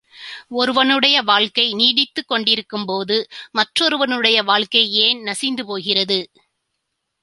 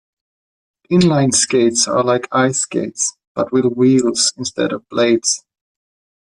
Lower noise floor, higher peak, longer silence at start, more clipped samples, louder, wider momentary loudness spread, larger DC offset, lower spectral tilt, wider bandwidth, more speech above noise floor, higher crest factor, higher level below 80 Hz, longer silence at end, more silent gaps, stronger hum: second, -75 dBFS vs under -90 dBFS; about the same, 0 dBFS vs -2 dBFS; second, 0.15 s vs 0.9 s; neither; about the same, -16 LUFS vs -16 LUFS; first, 10 LU vs 7 LU; neither; second, -2.5 dB/octave vs -4 dB/octave; about the same, 11.5 kHz vs 11.5 kHz; second, 57 dB vs over 75 dB; first, 20 dB vs 14 dB; second, -66 dBFS vs -56 dBFS; first, 1 s vs 0.85 s; second, none vs 3.27-3.35 s; neither